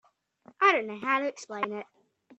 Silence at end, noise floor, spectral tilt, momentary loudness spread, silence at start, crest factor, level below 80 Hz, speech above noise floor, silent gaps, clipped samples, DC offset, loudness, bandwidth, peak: 0.55 s; -59 dBFS; -3.5 dB/octave; 11 LU; 0.6 s; 22 dB; -82 dBFS; 28 dB; none; under 0.1%; under 0.1%; -28 LUFS; 8.2 kHz; -8 dBFS